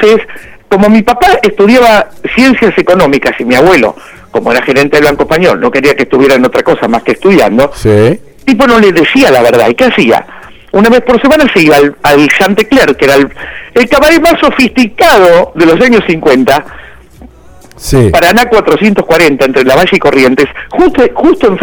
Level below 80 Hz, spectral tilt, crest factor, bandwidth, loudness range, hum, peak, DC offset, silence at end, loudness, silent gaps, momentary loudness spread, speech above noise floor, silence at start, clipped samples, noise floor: -30 dBFS; -5 dB/octave; 6 dB; over 20 kHz; 2 LU; none; 0 dBFS; under 0.1%; 0 s; -6 LUFS; none; 6 LU; 28 dB; 0 s; 2%; -34 dBFS